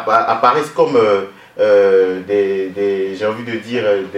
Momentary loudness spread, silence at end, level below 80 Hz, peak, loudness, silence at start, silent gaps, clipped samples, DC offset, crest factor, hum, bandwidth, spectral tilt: 8 LU; 0 s; -64 dBFS; 0 dBFS; -15 LUFS; 0 s; none; under 0.1%; under 0.1%; 14 dB; none; 11.5 kHz; -5.5 dB/octave